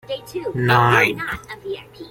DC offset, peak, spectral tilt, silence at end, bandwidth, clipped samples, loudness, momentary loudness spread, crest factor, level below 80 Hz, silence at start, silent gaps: under 0.1%; -2 dBFS; -5.5 dB/octave; 0 s; 16.5 kHz; under 0.1%; -18 LUFS; 17 LU; 18 dB; -50 dBFS; 0.1 s; none